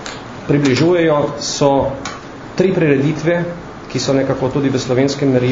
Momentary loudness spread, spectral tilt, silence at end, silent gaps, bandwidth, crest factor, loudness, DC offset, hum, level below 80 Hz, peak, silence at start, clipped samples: 14 LU; -6 dB/octave; 0 s; none; 7.6 kHz; 16 dB; -16 LUFS; under 0.1%; none; -44 dBFS; 0 dBFS; 0 s; under 0.1%